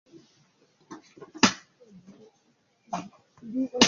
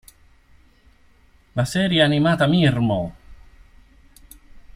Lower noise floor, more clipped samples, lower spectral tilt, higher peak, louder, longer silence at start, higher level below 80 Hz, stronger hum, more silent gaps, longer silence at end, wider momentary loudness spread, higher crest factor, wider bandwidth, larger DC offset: first, -68 dBFS vs -54 dBFS; neither; second, -2.5 dB/octave vs -6 dB/octave; about the same, -2 dBFS vs -2 dBFS; second, -28 LUFS vs -19 LUFS; second, 0.9 s vs 1.55 s; second, -64 dBFS vs -48 dBFS; neither; neither; second, 0 s vs 0.15 s; first, 25 LU vs 10 LU; first, 28 dB vs 20 dB; second, 7.6 kHz vs 15.5 kHz; neither